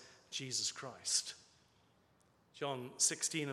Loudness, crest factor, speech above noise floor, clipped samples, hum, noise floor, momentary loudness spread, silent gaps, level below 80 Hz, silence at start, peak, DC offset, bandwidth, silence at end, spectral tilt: -37 LUFS; 22 dB; 32 dB; under 0.1%; none; -72 dBFS; 13 LU; none; -86 dBFS; 0 s; -20 dBFS; under 0.1%; 15 kHz; 0 s; -1.5 dB/octave